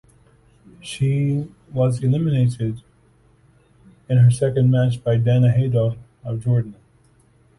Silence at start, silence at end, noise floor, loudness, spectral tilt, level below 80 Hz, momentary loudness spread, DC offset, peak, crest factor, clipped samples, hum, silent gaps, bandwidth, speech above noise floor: 0.85 s; 0.85 s; -56 dBFS; -20 LUFS; -8 dB/octave; -50 dBFS; 14 LU; under 0.1%; -6 dBFS; 14 dB; under 0.1%; none; none; 11.5 kHz; 38 dB